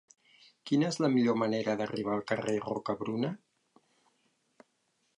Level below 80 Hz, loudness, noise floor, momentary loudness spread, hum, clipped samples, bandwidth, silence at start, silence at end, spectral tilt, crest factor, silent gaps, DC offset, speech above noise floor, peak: -74 dBFS; -31 LUFS; -76 dBFS; 8 LU; none; under 0.1%; 10.5 kHz; 0.65 s; 1.8 s; -6 dB/octave; 18 dB; none; under 0.1%; 46 dB; -14 dBFS